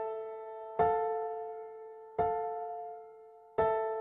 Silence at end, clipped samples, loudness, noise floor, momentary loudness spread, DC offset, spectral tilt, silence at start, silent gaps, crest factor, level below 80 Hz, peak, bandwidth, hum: 0 s; under 0.1%; -35 LUFS; -55 dBFS; 17 LU; under 0.1%; -9 dB/octave; 0 s; none; 18 dB; -62 dBFS; -16 dBFS; 3.8 kHz; none